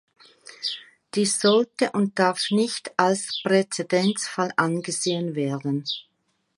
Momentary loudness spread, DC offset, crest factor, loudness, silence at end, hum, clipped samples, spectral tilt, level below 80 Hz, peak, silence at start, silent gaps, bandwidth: 9 LU; under 0.1%; 22 dB; -24 LUFS; 0.55 s; none; under 0.1%; -4 dB/octave; -74 dBFS; -2 dBFS; 0.45 s; none; 11.5 kHz